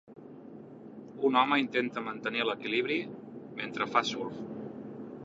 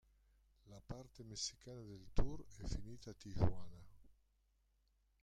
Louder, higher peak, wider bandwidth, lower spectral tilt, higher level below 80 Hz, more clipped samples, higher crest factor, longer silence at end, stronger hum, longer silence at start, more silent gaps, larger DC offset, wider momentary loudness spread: first, -31 LUFS vs -47 LUFS; first, -10 dBFS vs -20 dBFS; second, 7.8 kHz vs 9.8 kHz; about the same, -4.5 dB/octave vs -5 dB/octave; second, -76 dBFS vs -52 dBFS; neither; about the same, 22 dB vs 24 dB; second, 0 s vs 1.2 s; neither; second, 0.05 s vs 0.65 s; neither; neither; first, 22 LU vs 19 LU